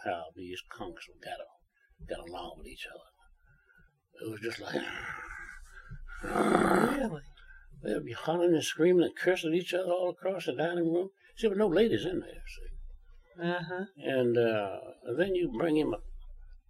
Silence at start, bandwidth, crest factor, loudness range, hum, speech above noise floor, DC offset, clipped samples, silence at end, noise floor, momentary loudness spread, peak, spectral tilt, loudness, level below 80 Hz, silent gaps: 0 s; 15 kHz; 24 dB; 15 LU; none; 34 dB; under 0.1%; under 0.1%; 0.1 s; -65 dBFS; 19 LU; -8 dBFS; -5.5 dB/octave; -31 LUFS; -52 dBFS; none